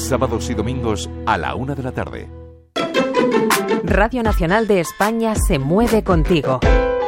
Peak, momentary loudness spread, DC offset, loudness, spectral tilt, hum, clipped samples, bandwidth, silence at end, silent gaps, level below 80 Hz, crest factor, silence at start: -2 dBFS; 9 LU; under 0.1%; -18 LUFS; -5.5 dB/octave; none; under 0.1%; 16.5 kHz; 0 s; none; -26 dBFS; 14 dB; 0 s